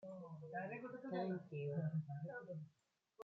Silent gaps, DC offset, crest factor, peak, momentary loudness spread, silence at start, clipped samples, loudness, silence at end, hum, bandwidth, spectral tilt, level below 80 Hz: none; under 0.1%; 16 dB; -32 dBFS; 10 LU; 0 s; under 0.1%; -47 LUFS; 0 s; none; 4.6 kHz; -8 dB/octave; under -90 dBFS